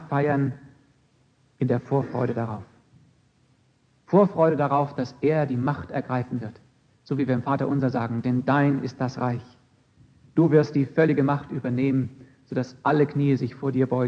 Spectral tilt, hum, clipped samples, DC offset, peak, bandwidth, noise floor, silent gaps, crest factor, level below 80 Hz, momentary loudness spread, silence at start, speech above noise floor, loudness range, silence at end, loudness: -9 dB/octave; none; under 0.1%; under 0.1%; -4 dBFS; 7 kHz; -63 dBFS; none; 20 dB; -64 dBFS; 10 LU; 0 s; 40 dB; 4 LU; 0 s; -24 LUFS